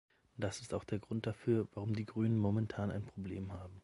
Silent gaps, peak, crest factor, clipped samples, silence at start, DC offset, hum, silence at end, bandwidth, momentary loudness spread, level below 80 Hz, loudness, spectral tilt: none; -22 dBFS; 16 dB; under 0.1%; 0.35 s; under 0.1%; none; 0.05 s; 11.5 kHz; 10 LU; -60 dBFS; -39 LUFS; -7.5 dB/octave